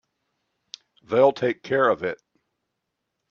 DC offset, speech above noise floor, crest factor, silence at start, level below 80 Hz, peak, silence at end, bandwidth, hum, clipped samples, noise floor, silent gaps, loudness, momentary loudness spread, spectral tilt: under 0.1%; 59 dB; 22 dB; 1.1 s; -70 dBFS; -4 dBFS; 1.15 s; 7 kHz; none; under 0.1%; -80 dBFS; none; -22 LUFS; 17 LU; -6 dB/octave